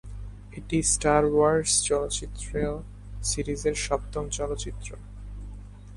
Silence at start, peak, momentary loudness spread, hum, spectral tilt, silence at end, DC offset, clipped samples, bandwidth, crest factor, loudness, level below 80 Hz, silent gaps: 0.05 s; -6 dBFS; 21 LU; 50 Hz at -40 dBFS; -3.5 dB/octave; 0 s; under 0.1%; under 0.1%; 11.5 kHz; 20 dB; -26 LUFS; -38 dBFS; none